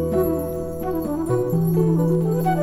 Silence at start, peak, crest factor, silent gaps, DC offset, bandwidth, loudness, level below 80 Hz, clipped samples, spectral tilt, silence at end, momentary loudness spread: 0 s; -8 dBFS; 14 dB; none; under 0.1%; 16 kHz; -21 LUFS; -42 dBFS; under 0.1%; -9 dB/octave; 0 s; 7 LU